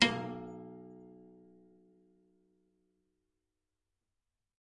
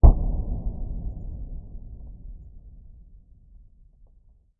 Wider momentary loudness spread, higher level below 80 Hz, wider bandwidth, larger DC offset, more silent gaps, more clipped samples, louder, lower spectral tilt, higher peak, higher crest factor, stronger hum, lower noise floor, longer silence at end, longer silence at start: about the same, 23 LU vs 21 LU; second, -76 dBFS vs -26 dBFS; first, 9 kHz vs 1.3 kHz; neither; neither; neither; second, -37 LUFS vs -30 LUFS; second, -3 dB/octave vs -15 dB/octave; second, -8 dBFS vs 0 dBFS; first, 34 dB vs 24 dB; neither; first, -88 dBFS vs -56 dBFS; first, 3.3 s vs 1.65 s; about the same, 0 s vs 0.05 s